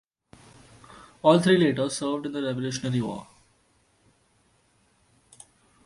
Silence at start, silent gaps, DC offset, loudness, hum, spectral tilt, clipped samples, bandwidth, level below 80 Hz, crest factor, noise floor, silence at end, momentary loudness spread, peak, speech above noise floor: 0.95 s; none; under 0.1%; -24 LUFS; none; -5.5 dB/octave; under 0.1%; 11.5 kHz; -64 dBFS; 24 dB; -65 dBFS; 2.65 s; 11 LU; -4 dBFS; 42 dB